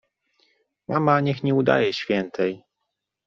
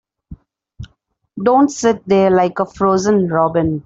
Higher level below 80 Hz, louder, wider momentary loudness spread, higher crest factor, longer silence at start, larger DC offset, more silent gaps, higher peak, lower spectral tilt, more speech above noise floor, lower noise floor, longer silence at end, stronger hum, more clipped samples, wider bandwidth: second, -64 dBFS vs -46 dBFS; second, -22 LUFS vs -15 LUFS; first, 8 LU vs 5 LU; first, 20 dB vs 14 dB; first, 0.9 s vs 0.3 s; neither; neither; about the same, -4 dBFS vs -2 dBFS; second, -5 dB/octave vs -6.5 dB/octave; first, 59 dB vs 48 dB; first, -80 dBFS vs -62 dBFS; first, 0.7 s vs 0.05 s; neither; neither; about the same, 7.4 kHz vs 8 kHz